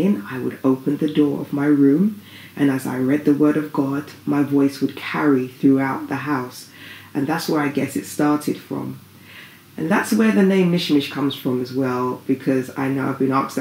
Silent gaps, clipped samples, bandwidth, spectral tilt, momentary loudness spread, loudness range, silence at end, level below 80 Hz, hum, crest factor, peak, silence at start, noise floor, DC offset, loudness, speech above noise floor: none; under 0.1%; 16 kHz; -6.5 dB/octave; 13 LU; 4 LU; 0 s; -72 dBFS; none; 16 dB; -4 dBFS; 0 s; -43 dBFS; under 0.1%; -20 LUFS; 23 dB